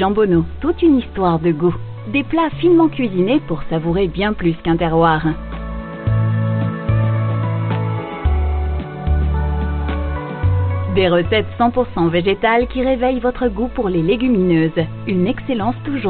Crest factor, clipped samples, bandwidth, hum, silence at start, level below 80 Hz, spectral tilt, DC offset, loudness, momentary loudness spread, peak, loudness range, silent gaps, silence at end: 14 dB; under 0.1%; 4.5 kHz; none; 0 s; -26 dBFS; -6.5 dB/octave; under 0.1%; -17 LUFS; 7 LU; -2 dBFS; 3 LU; none; 0 s